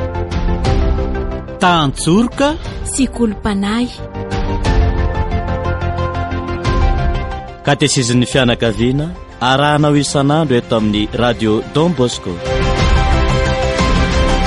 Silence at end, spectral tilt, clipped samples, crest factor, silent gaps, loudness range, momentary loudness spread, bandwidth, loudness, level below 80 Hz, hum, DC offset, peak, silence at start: 0 s; -5.5 dB/octave; under 0.1%; 14 dB; none; 4 LU; 8 LU; 11.5 kHz; -15 LUFS; -20 dBFS; none; under 0.1%; 0 dBFS; 0 s